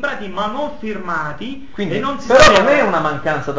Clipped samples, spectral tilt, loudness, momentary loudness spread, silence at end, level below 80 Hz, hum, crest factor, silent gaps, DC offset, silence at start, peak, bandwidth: 0.1%; -4 dB/octave; -15 LUFS; 17 LU; 0 s; -38 dBFS; none; 16 dB; none; 3%; 0 s; 0 dBFS; 8 kHz